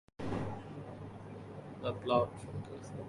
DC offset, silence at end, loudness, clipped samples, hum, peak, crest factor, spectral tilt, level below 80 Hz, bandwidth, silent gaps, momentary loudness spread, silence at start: under 0.1%; 0 s; -39 LUFS; under 0.1%; none; -16 dBFS; 22 dB; -7 dB/octave; -60 dBFS; 11.5 kHz; none; 16 LU; 0.2 s